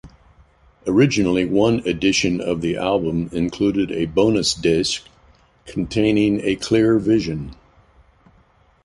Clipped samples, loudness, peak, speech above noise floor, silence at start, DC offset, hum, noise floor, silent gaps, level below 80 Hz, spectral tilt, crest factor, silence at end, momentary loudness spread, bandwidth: under 0.1%; -19 LUFS; -4 dBFS; 37 dB; 0.05 s; under 0.1%; none; -56 dBFS; none; -44 dBFS; -5 dB/octave; 16 dB; 1.3 s; 9 LU; 11.5 kHz